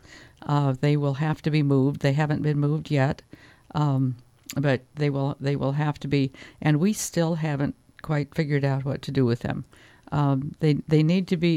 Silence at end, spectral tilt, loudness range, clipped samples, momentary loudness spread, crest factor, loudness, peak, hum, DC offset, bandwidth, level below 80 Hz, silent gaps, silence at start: 0 s; -7 dB/octave; 3 LU; under 0.1%; 8 LU; 18 dB; -25 LUFS; -8 dBFS; none; under 0.1%; 15 kHz; -54 dBFS; none; 0.1 s